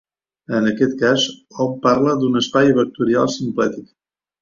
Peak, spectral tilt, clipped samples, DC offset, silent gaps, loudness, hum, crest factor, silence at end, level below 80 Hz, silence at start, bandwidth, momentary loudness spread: -2 dBFS; -5 dB/octave; under 0.1%; under 0.1%; none; -18 LUFS; none; 16 dB; 0.6 s; -56 dBFS; 0.5 s; 7.6 kHz; 8 LU